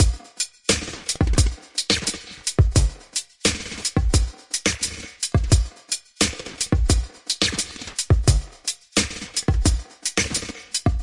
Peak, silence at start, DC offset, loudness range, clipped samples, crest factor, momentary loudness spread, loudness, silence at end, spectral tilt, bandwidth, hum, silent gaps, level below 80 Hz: -4 dBFS; 0 s; 0.1%; 1 LU; under 0.1%; 18 dB; 8 LU; -23 LUFS; 0 s; -3.5 dB/octave; 11.5 kHz; none; none; -26 dBFS